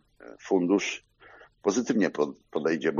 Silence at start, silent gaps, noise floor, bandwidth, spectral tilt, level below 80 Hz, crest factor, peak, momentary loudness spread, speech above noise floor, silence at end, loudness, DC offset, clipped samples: 0.25 s; none; -54 dBFS; 7.4 kHz; -4.5 dB/octave; -70 dBFS; 16 dB; -12 dBFS; 8 LU; 28 dB; 0 s; -27 LUFS; under 0.1%; under 0.1%